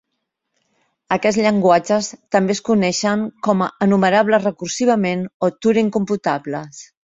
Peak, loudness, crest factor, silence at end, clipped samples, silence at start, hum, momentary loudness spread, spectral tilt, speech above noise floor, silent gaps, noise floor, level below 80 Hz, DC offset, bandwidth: -2 dBFS; -18 LUFS; 16 dB; 0.2 s; under 0.1%; 1.1 s; none; 8 LU; -5 dB/octave; 59 dB; 5.34-5.40 s; -76 dBFS; -60 dBFS; under 0.1%; 7.8 kHz